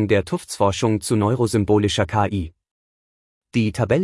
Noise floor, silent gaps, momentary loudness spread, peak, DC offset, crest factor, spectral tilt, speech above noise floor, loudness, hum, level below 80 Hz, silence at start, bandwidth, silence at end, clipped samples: under -90 dBFS; 2.71-3.41 s; 8 LU; -4 dBFS; under 0.1%; 16 dB; -6 dB/octave; over 71 dB; -20 LUFS; none; -48 dBFS; 0 s; 12 kHz; 0 s; under 0.1%